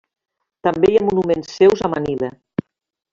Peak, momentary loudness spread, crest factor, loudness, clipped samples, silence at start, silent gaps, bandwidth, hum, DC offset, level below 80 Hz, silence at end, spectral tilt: -2 dBFS; 14 LU; 16 dB; -18 LUFS; under 0.1%; 0.65 s; none; 7.4 kHz; none; under 0.1%; -50 dBFS; 0.8 s; -6.5 dB/octave